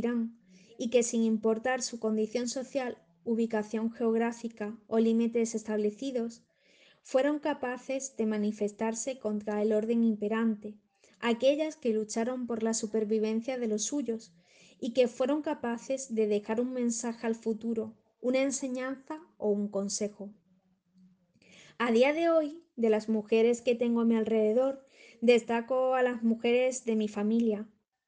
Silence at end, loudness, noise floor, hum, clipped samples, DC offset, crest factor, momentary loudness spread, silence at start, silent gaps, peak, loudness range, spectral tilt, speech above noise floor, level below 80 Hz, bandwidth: 0.45 s; -30 LUFS; -70 dBFS; none; under 0.1%; under 0.1%; 20 dB; 10 LU; 0 s; none; -10 dBFS; 5 LU; -4.5 dB/octave; 40 dB; -76 dBFS; 9.8 kHz